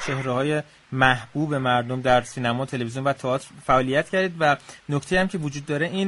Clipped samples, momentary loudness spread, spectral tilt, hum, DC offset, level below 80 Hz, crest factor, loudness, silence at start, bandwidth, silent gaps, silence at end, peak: under 0.1%; 8 LU; -5.5 dB/octave; none; under 0.1%; -48 dBFS; 20 dB; -23 LUFS; 0 s; 11.5 kHz; none; 0 s; -2 dBFS